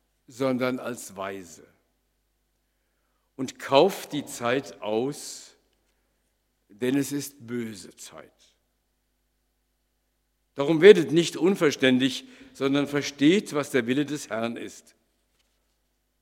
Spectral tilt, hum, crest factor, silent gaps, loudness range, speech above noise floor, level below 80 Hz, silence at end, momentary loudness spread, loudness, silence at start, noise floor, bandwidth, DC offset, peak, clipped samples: -5 dB/octave; 50 Hz at -70 dBFS; 26 dB; none; 12 LU; 49 dB; -72 dBFS; 1.4 s; 18 LU; -24 LUFS; 0.35 s; -74 dBFS; 16 kHz; under 0.1%; 0 dBFS; under 0.1%